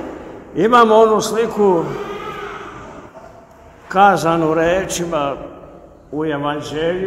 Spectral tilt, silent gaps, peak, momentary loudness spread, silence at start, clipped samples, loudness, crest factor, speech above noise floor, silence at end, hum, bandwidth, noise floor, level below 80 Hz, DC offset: -5 dB/octave; none; 0 dBFS; 20 LU; 0 s; under 0.1%; -16 LUFS; 18 dB; 27 dB; 0 s; none; 15.5 kHz; -42 dBFS; -46 dBFS; under 0.1%